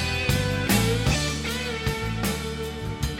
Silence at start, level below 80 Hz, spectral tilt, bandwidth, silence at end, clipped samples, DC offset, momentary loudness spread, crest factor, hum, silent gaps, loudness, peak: 0 s; -34 dBFS; -4.5 dB/octave; 17 kHz; 0 s; under 0.1%; under 0.1%; 9 LU; 18 dB; none; none; -25 LUFS; -8 dBFS